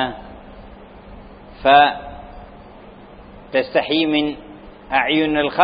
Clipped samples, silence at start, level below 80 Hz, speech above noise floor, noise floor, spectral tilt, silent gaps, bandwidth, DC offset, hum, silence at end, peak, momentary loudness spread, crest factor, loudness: under 0.1%; 0 s; -44 dBFS; 25 dB; -41 dBFS; -9.5 dB/octave; none; 5.2 kHz; under 0.1%; none; 0 s; 0 dBFS; 27 LU; 20 dB; -17 LUFS